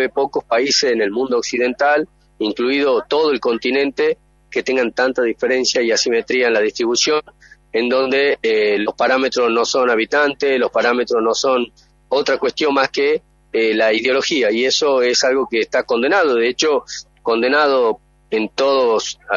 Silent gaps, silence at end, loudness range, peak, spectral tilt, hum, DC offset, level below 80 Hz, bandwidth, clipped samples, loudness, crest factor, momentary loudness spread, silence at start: none; 0 s; 2 LU; -2 dBFS; -2 dB/octave; none; under 0.1%; -56 dBFS; 7.6 kHz; under 0.1%; -17 LUFS; 16 dB; 6 LU; 0 s